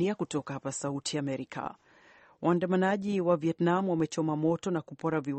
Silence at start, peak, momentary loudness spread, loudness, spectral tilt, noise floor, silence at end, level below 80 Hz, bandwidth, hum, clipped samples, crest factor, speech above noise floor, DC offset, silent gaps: 0 s; -12 dBFS; 8 LU; -30 LUFS; -6 dB/octave; -59 dBFS; 0 s; -70 dBFS; 8.8 kHz; none; under 0.1%; 18 dB; 29 dB; under 0.1%; none